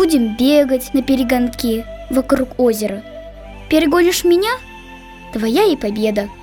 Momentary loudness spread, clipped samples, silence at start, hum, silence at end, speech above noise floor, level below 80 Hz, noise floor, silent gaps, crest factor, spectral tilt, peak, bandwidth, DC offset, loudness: 21 LU; under 0.1%; 0 s; none; 0 s; 21 dB; -38 dBFS; -36 dBFS; none; 14 dB; -4.5 dB/octave; -2 dBFS; 19.5 kHz; under 0.1%; -16 LUFS